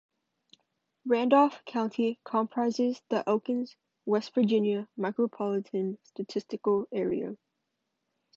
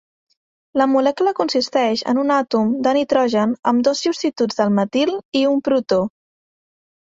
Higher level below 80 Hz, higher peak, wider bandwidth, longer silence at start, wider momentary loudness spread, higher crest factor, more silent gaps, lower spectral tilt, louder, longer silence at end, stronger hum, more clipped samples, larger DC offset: second, -76 dBFS vs -62 dBFS; second, -10 dBFS vs -4 dBFS; about the same, 7.6 kHz vs 7.8 kHz; first, 1.05 s vs 0.75 s; first, 11 LU vs 4 LU; about the same, 20 dB vs 16 dB; second, none vs 3.59-3.63 s, 5.25-5.32 s; first, -7 dB/octave vs -5 dB/octave; second, -29 LUFS vs -18 LUFS; about the same, 1 s vs 0.95 s; neither; neither; neither